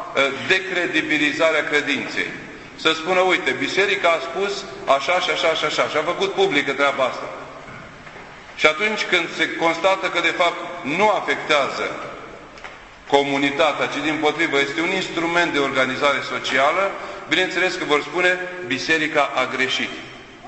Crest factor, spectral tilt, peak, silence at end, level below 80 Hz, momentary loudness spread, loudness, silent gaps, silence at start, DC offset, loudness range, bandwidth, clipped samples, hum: 20 dB; -3 dB/octave; 0 dBFS; 0 s; -56 dBFS; 17 LU; -19 LUFS; none; 0 s; under 0.1%; 2 LU; 8.4 kHz; under 0.1%; none